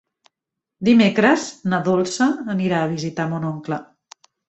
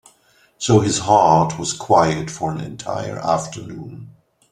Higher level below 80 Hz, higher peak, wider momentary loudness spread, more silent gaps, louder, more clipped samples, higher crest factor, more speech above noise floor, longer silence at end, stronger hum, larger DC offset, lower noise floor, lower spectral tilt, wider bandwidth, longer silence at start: second, -60 dBFS vs -50 dBFS; about the same, -2 dBFS vs -2 dBFS; second, 11 LU vs 18 LU; neither; about the same, -20 LUFS vs -18 LUFS; neither; about the same, 20 dB vs 18 dB; first, 65 dB vs 38 dB; first, 0.65 s vs 0.4 s; neither; neither; first, -84 dBFS vs -57 dBFS; about the same, -5.5 dB/octave vs -5 dB/octave; second, 8.2 kHz vs 12.5 kHz; first, 0.8 s vs 0.6 s